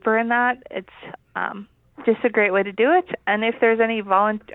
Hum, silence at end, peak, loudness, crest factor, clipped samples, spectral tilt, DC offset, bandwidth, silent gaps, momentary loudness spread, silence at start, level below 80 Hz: none; 0 s; -4 dBFS; -20 LUFS; 18 dB; under 0.1%; -8.5 dB/octave; under 0.1%; 4 kHz; none; 15 LU; 0.05 s; -64 dBFS